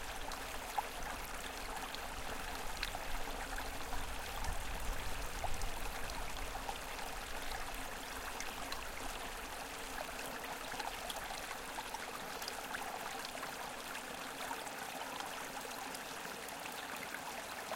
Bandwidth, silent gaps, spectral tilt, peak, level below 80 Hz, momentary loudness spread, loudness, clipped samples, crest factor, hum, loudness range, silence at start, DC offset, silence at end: 17 kHz; none; -2 dB/octave; -22 dBFS; -50 dBFS; 2 LU; -43 LUFS; under 0.1%; 20 dB; none; 1 LU; 0 s; under 0.1%; 0 s